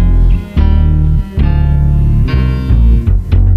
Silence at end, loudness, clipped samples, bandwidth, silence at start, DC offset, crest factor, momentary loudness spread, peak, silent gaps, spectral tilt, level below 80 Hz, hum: 0 s; -12 LUFS; under 0.1%; 5.2 kHz; 0 s; under 0.1%; 8 dB; 3 LU; 0 dBFS; none; -9.5 dB/octave; -10 dBFS; none